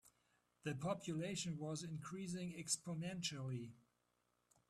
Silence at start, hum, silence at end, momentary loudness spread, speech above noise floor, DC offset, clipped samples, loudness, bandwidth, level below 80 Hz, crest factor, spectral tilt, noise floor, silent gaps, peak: 0.05 s; 60 Hz at -65 dBFS; 0.9 s; 7 LU; 38 dB; under 0.1%; under 0.1%; -45 LUFS; 14 kHz; -78 dBFS; 20 dB; -4 dB/octave; -84 dBFS; none; -26 dBFS